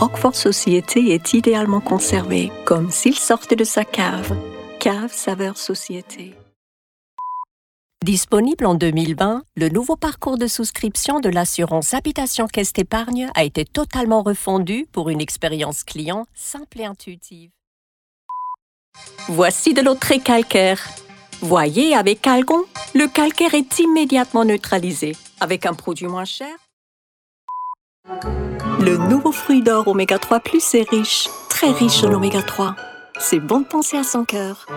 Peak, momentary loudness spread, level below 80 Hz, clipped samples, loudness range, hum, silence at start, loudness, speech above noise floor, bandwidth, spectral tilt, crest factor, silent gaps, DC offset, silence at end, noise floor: 0 dBFS; 15 LU; -44 dBFS; under 0.1%; 10 LU; none; 0 s; -18 LUFS; over 72 dB; 19 kHz; -4 dB/octave; 18 dB; 6.56-7.17 s, 7.51-7.90 s, 17.67-18.29 s, 18.62-18.92 s, 26.73-27.48 s, 27.81-28.03 s; under 0.1%; 0 s; under -90 dBFS